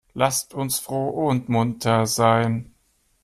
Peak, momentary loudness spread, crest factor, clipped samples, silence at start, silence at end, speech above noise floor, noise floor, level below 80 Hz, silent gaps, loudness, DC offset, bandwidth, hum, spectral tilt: -4 dBFS; 7 LU; 18 dB; under 0.1%; 0.15 s; 0.6 s; 43 dB; -65 dBFS; -56 dBFS; none; -22 LUFS; under 0.1%; 15 kHz; none; -5 dB/octave